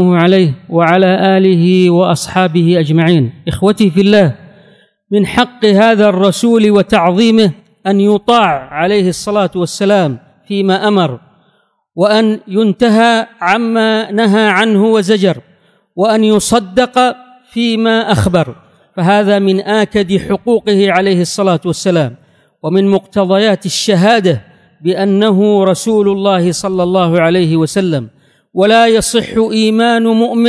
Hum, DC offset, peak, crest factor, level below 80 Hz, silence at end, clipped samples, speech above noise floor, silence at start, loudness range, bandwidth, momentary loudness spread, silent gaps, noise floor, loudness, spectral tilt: none; under 0.1%; 0 dBFS; 10 dB; -44 dBFS; 0 s; 0.4%; 46 dB; 0 s; 3 LU; 11 kHz; 7 LU; none; -56 dBFS; -11 LUFS; -5.5 dB/octave